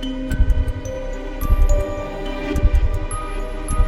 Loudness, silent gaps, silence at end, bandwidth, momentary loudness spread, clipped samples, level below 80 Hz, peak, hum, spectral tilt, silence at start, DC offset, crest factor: -23 LUFS; none; 0 s; 12.5 kHz; 9 LU; under 0.1%; -18 dBFS; -4 dBFS; none; -6 dB/octave; 0 s; under 0.1%; 14 dB